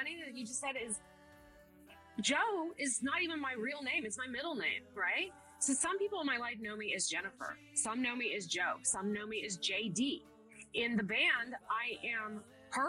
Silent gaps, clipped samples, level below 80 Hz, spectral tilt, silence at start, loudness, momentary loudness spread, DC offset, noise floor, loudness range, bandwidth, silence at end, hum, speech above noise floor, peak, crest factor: none; under 0.1%; -74 dBFS; -2 dB/octave; 0 s; -36 LUFS; 9 LU; under 0.1%; -61 dBFS; 2 LU; 13.5 kHz; 0 s; none; 23 dB; -22 dBFS; 18 dB